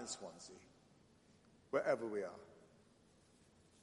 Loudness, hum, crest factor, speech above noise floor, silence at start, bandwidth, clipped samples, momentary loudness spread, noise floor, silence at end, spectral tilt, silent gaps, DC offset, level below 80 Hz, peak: -42 LUFS; none; 22 dB; 27 dB; 0 s; 11.5 kHz; under 0.1%; 25 LU; -70 dBFS; 1.15 s; -3.5 dB/octave; none; under 0.1%; -82 dBFS; -24 dBFS